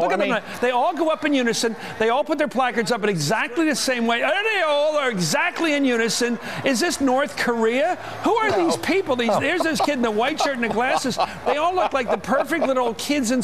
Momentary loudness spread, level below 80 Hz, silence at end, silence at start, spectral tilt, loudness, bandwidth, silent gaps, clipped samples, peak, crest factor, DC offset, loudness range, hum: 3 LU; -58 dBFS; 0 s; 0 s; -3.5 dB/octave; -21 LUFS; 15 kHz; none; under 0.1%; -6 dBFS; 14 dB; 0.6%; 1 LU; none